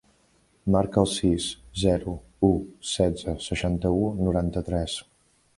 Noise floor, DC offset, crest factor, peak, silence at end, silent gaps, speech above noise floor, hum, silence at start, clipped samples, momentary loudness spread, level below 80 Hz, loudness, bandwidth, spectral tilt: -63 dBFS; under 0.1%; 22 dB; -4 dBFS; 0.55 s; none; 39 dB; none; 0.65 s; under 0.1%; 8 LU; -40 dBFS; -26 LUFS; 11.5 kHz; -6 dB/octave